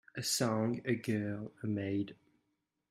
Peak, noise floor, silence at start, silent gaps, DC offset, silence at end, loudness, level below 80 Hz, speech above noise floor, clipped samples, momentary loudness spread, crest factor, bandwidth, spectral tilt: -18 dBFS; -83 dBFS; 0.15 s; none; under 0.1%; 0.75 s; -36 LUFS; -74 dBFS; 48 dB; under 0.1%; 9 LU; 18 dB; 15.5 kHz; -4.5 dB/octave